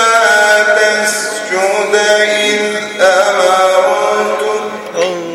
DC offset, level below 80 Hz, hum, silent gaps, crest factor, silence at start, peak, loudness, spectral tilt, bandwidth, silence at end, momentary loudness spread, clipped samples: under 0.1%; -64 dBFS; none; none; 12 dB; 0 s; 0 dBFS; -11 LUFS; -1 dB/octave; 16.5 kHz; 0 s; 8 LU; under 0.1%